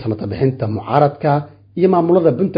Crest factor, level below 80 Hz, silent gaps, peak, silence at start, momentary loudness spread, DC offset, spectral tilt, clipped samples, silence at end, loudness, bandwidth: 16 dB; -46 dBFS; none; 0 dBFS; 0 s; 10 LU; under 0.1%; -11.5 dB/octave; under 0.1%; 0 s; -16 LUFS; 5.2 kHz